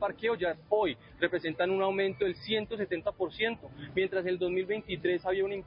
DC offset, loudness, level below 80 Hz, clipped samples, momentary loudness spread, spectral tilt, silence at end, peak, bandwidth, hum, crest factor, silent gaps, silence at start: under 0.1%; -32 LUFS; -60 dBFS; under 0.1%; 4 LU; -9 dB/octave; 0 s; -14 dBFS; 5.4 kHz; none; 18 dB; none; 0 s